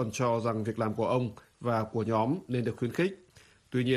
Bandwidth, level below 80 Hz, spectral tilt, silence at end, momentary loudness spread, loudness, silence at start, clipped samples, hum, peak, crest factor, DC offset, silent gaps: 14 kHz; -64 dBFS; -6.5 dB/octave; 0 s; 6 LU; -31 LUFS; 0 s; under 0.1%; none; -14 dBFS; 16 dB; under 0.1%; none